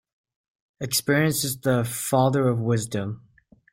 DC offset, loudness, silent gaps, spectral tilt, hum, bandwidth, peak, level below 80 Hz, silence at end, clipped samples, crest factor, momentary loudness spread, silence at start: under 0.1%; -23 LUFS; none; -5 dB/octave; none; 16.5 kHz; -8 dBFS; -60 dBFS; 0.55 s; under 0.1%; 18 dB; 11 LU; 0.8 s